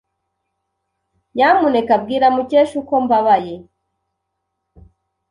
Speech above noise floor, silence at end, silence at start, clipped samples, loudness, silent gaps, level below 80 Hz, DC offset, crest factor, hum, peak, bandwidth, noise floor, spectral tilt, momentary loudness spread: 60 dB; 1.7 s; 1.35 s; under 0.1%; -15 LUFS; none; -56 dBFS; under 0.1%; 16 dB; none; -2 dBFS; 11 kHz; -75 dBFS; -6 dB/octave; 10 LU